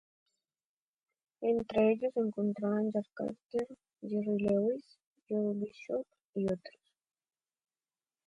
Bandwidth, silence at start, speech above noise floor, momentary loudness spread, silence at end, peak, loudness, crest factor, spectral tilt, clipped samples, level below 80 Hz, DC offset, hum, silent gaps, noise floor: 7.4 kHz; 1.4 s; over 57 dB; 11 LU; 1.6 s; -18 dBFS; -34 LUFS; 18 dB; -8.5 dB/octave; under 0.1%; -70 dBFS; under 0.1%; none; 3.44-3.50 s, 5.06-5.16 s, 5.22-5.26 s, 6.24-6.33 s; under -90 dBFS